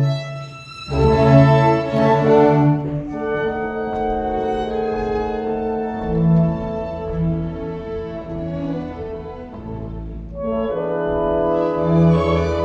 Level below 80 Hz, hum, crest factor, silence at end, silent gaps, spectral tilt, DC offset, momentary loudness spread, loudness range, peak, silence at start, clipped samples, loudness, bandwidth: -36 dBFS; none; 18 dB; 0 s; none; -9 dB/octave; under 0.1%; 17 LU; 11 LU; 0 dBFS; 0 s; under 0.1%; -19 LUFS; 7.2 kHz